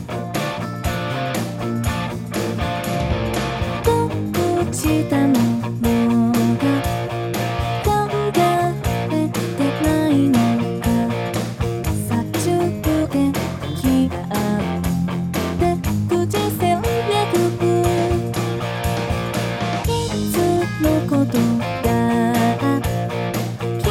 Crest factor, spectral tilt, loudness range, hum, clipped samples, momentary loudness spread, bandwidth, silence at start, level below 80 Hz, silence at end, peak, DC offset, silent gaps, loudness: 16 dB; -6 dB/octave; 2 LU; none; under 0.1%; 6 LU; 16.5 kHz; 0 s; -34 dBFS; 0 s; -2 dBFS; under 0.1%; none; -20 LUFS